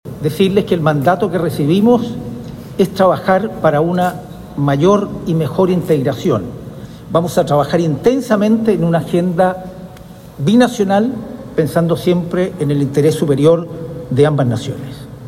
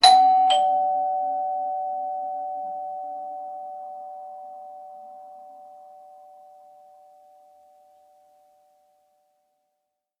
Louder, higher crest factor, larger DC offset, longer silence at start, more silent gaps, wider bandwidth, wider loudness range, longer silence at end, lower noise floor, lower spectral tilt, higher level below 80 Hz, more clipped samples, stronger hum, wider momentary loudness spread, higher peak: first, -15 LUFS vs -24 LUFS; second, 14 dB vs 24 dB; neither; about the same, 0.05 s vs 0 s; neither; first, 16 kHz vs 11 kHz; second, 1 LU vs 25 LU; second, 0 s vs 4.2 s; second, -35 dBFS vs -80 dBFS; first, -7 dB/octave vs 0.5 dB/octave; first, -44 dBFS vs -76 dBFS; neither; neither; second, 15 LU vs 26 LU; about the same, 0 dBFS vs -2 dBFS